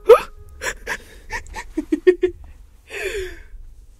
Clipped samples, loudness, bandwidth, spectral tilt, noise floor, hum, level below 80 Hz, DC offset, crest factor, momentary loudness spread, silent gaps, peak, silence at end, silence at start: under 0.1%; -22 LUFS; 15.5 kHz; -4.5 dB/octave; -42 dBFS; none; -40 dBFS; under 0.1%; 22 dB; 19 LU; none; 0 dBFS; 0.2 s; 0.05 s